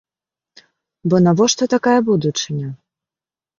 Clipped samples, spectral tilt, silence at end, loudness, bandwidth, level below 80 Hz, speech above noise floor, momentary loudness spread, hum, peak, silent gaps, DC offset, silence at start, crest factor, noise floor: under 0.1%; -5 dB/octave; 0.85 s; -16 LUFS; 7.4 kHz; -60 dBFS; over 74 dB; 13 LU; none; -2 dBFS; none; under 0.1%; 1.05 s; 18 dB; under -90 dBFS